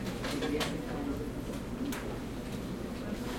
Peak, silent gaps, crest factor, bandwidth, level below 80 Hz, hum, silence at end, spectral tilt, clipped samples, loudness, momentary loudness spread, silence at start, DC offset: -18 dBFS; none; 18 dB; 16.5 kHz; -46 dBFS; none; 0 s; -5 dB/octave; under 0.1%; -37 LUFS; 6 LU; 0 s; under 0.1%